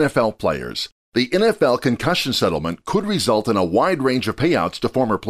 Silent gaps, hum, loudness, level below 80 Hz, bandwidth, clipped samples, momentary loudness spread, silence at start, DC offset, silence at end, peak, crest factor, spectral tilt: 0.92-1.12 s; none; -19 LUFS; -48 dBFS; 15.5 kHz; under 0.1%; 6 LU; 0 s; under 0.1%; 0 s; -6 dBFS; 14 dB; -5 dB/octave